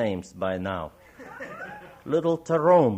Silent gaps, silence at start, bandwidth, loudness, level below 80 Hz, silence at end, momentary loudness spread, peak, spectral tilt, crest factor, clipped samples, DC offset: none; 0 s; 9 kHz; -25 LUFS; -62 dBFS; 0 s; 21 LU; -8 dBFS; -7.5 dB/octave; 18 dB; under 0.1%; under 0.1%